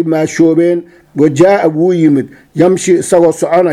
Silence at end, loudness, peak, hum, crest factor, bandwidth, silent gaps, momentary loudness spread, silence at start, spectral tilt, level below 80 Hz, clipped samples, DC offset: 0 s; -10 LUFS; 0 dBFS; none; 10 dB; 13 kHz; none; 6 LU; 0 s; -6.5 dB/octave; -50 dBFS; 0.4%; under 0.1%